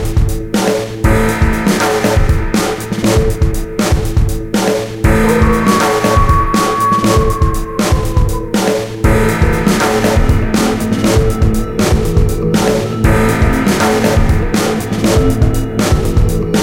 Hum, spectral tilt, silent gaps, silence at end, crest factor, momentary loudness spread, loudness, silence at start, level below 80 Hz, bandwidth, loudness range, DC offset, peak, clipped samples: none; -5.5 dB/octave; none; 0 s; 12 dB; 4 LU; -13 LUFS; 0 s; -18 dBFS; 17 kHz; 2 LU; under 0.1%; 0 dBFS; under 0.1%